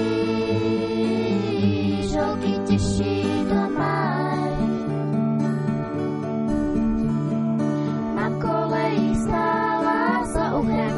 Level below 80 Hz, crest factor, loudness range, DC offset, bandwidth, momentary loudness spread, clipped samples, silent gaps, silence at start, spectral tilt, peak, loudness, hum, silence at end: -40 dBFS; 14 dB; 1 LU; under 0.1%; 11.5 kHz; 3 LU; under 0.1%; none; 0 s; -7 dB/octave; -8 dBFS; -23 LUFS; none; 0 s